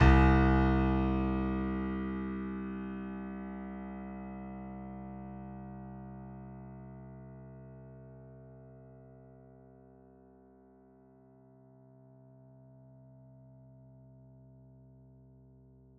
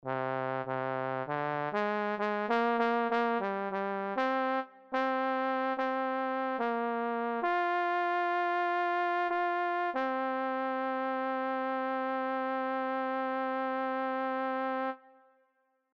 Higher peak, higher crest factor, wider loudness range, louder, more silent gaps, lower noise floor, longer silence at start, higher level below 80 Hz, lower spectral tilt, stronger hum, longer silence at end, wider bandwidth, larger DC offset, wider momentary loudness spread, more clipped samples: first, -10 dBFS vs -16 dBFS; first, 26 dB vs 16 dB; first, 25 LU vs 2 LU; about the same, -33 LUFS vs -32 LUFS; neither; second, -60 dBFS vs -75 dBFS; about the same, 0 s vs 0.05 s; first, -40 dBFS vs -84 dBFS; about the same, -7 dB/octave vs -7 dB/octave; neither; first, 6.7 s vs 0.95 s; about the same, 6.6 kHz vs 7 kHz; neither; first, 29 LU vs 4 LU; neither